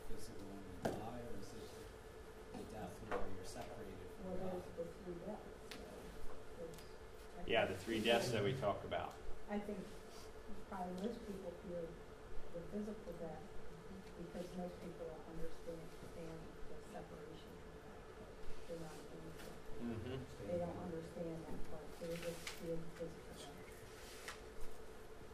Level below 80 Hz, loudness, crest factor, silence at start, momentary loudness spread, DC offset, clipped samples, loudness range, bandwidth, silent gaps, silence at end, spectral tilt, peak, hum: -58 dBFS; -48 LUFS; 24 dB; 0 s; 15 LU; under 0.1%; under 0.1%; 11 LU; 15.5 kHz; none; 0 s; -5 dB/octave; -22 dBFS; none